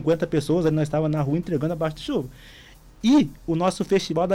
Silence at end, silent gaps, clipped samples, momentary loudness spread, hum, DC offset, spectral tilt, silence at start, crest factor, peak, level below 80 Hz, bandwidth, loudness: 0 s; none; under 0.1%; 8 LU; none; under 0.1%; -7 dB/octave; 0 s; 12 dB; -10 dBFS; -48 dBFS; 15 kHz; -23 LUFS